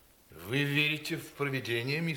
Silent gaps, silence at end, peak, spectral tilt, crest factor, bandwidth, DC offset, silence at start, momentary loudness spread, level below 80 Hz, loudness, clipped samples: none; 0 s; -16 dBFS; -5 dB/octave; 18 dB; 18.5 kHz; under 0.1%; 0.3 s; 9 LU; -68 dBFS; -31 LUFS; under 0.1%